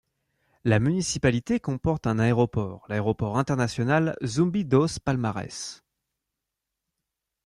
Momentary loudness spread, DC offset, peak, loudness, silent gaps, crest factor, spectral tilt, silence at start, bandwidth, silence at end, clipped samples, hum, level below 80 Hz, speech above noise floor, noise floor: 8 LU; under 0.1%; -8 dBFS; -25 LUFS; none; 18 dB; -6 dB/octave; 0.65 s; 11.5 kHz; 1.7 s; under 0.1%; none; -52 dBFS; 60 dB; -85 dBFS